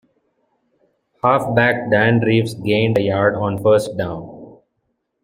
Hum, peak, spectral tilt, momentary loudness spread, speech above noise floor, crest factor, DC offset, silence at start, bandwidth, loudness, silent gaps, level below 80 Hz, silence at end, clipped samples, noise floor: none; -2 dBFS; -7 dB/octave; 10 LU; 55 dB; 16 dB; under 0.1%; 1.25 s; 15.5 kHz; -17 LUFS; none; -54 dBFS; 0.7 s; under 0.1%; -71 dBFS